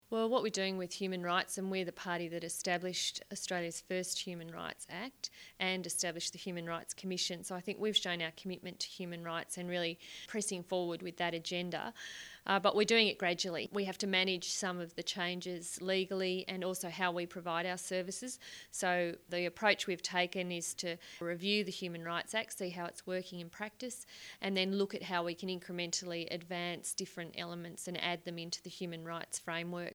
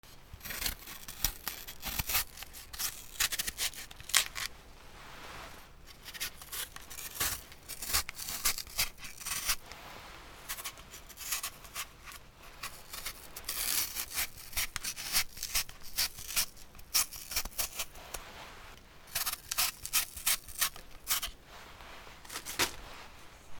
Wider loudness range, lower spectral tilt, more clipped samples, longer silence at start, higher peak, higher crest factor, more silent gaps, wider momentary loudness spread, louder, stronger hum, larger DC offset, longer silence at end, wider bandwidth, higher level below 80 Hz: about the same, 6 LU vs 6 LU; first, -3 dB/octave vs 0.5 dB/octave; neither; about the same, 0.1 s vs 0.05 s; second, -14 dBFS vs -2 dBFS; second, 24 dB vs 36 dB; neither; second, 11 LU vs 19 LU; second, -37 LUFS vs -34 LUFS; neither; neither; about the same, 0 s vs 0 s; about the same, over 20 kHz vs over 20 kHz; second, -76 dBFS vs -52 dBFS